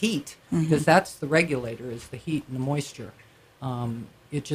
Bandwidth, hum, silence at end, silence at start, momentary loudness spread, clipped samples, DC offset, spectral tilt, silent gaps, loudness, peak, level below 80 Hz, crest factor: 15.5 kHz; none; 0 s; 0 s; 17 LU; under 0.1%; under 0.1%; -5.5 dB/octave; none; -26 LUFS; -4 dBFS; -58 dBFS; 24 dB